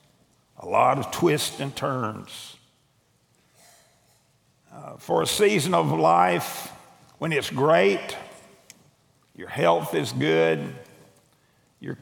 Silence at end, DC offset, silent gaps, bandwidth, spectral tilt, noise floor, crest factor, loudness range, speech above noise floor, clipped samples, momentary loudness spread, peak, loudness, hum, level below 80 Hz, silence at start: 0.05 s; under 0.1%; none; over 20 kHz; -4.5 dB/octave; -65 dBFS; 20 dB; 11 LU; 42 dB; under 0.1%; 21 LU; -4 dBFS; -23 LUFS; none; -66 dBFS; 0.6 s